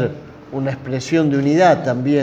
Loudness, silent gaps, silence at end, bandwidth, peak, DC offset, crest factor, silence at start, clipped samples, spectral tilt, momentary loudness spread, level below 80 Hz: -17 LUFS; none; 0 s; 8.6 kHz; -2 dBFS; under 0.1%; 16 dB; 0 s; under 0.1%; -7 dB/octave; 12 LU; -54 dBFS